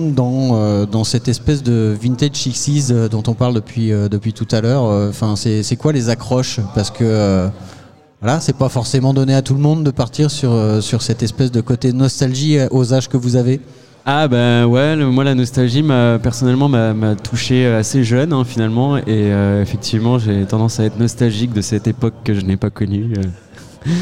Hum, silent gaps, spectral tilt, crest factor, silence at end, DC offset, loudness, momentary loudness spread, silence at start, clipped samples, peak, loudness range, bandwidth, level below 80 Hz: none; none; -6 dB/octave; 12 dB; 0 s; 0.9%; -15 LUFS; 5 LU; 0 s; under 0.1%; -2 dBFS; 3 LU; 12.5 kHz; -42 dBFS